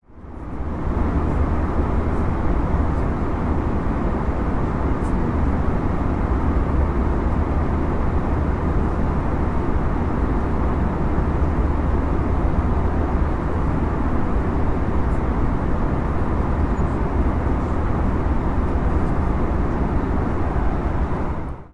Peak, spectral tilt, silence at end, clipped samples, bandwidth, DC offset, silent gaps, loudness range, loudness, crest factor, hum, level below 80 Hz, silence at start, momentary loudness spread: -6 dBFS; -9.5 dB/octave; 0.05 s; under 0.1%; 7 kHz; under 0.1%; none; 1 LU; -22 LUFS; 14 dB; none; -24 dBFS; 0.1 s; 2 LU